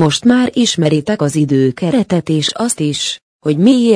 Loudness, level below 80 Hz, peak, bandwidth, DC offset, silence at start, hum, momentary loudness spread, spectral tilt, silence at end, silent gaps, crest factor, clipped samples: -14 LUFS; -52 dBFS; 0 dBFS; 10.5 kHz; under 0.1%; 0 s; none; 6 LU; -5 dB/octave; 0 s; 3.22-3.40 s; 12 dB; under 0.1%